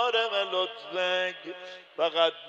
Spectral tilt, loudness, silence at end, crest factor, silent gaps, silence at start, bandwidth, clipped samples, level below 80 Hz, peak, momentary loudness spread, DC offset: -2.5 dB/octave; -28 LUFS; 0 s; 20 dB; none; 0 s; 8.2 kHz; under 0.1%; under -90 dBFS; -10 dBFS; 16 LU; under 0.1%